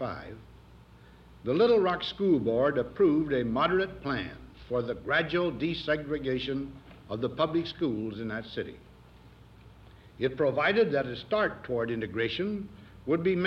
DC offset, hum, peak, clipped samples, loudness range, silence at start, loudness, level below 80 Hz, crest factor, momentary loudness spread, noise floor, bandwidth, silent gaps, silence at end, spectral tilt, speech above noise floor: under 0.1%; none; -14 dBFS; under 0.1%; 7 LU; 0 s; -29 LUFS; -56 dBFS; 16 dB; 14 LU; -54 dBFS; 6.8 kHz; none; 0 s; -7.5 dB/octave; 25 dB